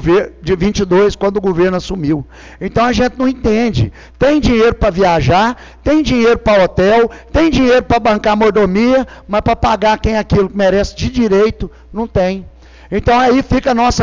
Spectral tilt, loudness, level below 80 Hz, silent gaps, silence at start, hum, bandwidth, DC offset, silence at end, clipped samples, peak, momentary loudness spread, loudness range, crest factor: -6 dB/octave; -13 LUFS; -28 dBFS; none; 0 s; none; 7.6 kHz; 0.3%; 0 s; under 0.1%; -6 dBFS; 8 LU; 3 LU; 8 dB